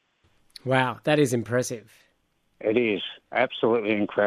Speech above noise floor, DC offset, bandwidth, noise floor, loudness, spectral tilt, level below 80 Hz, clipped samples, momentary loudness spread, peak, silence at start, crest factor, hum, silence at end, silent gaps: 45 dB; under 0.1%; 15 kHz; -69 dBFS; -25 LUFS; -5 dB/octave; -70 dBFS; under 0.1%; 8 LU; -6 dBFS; 0.65 s; 18 dB; none; 0 s; none